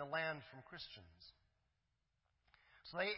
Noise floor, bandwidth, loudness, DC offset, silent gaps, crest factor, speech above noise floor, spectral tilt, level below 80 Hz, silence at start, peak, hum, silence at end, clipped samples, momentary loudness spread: -86 dBFS; 5.6 kHz; -47 LUFS; under 0.1%; none; 22 dB; 40 dB; -1.5 dB/octave; -78 dBFS; 0 s; -26 dBFS; none; 0 s; under 0.1%; 21 LU